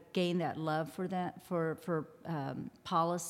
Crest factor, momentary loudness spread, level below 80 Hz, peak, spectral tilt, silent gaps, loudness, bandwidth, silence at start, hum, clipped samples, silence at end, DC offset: 18 dB; 7 LU; -76 dBFS; -18 dBFS; -6 dB/octave; none; -37 LUFS; 16 kHz; 0 s; none; under 0.1%; 0 s; under 0.1%